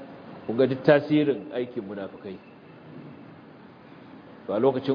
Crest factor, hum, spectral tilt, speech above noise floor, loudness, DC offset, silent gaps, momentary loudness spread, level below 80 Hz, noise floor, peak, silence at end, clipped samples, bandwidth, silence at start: 22 dB; none; -9 dB/octave; 24 dB; -25 LUFS; under 0.1%; none; 26 LU; -72 dBFS; -48 dBFS; -4 dBFS; 0 s; under 0.1%; 5.2 kHz; 0 s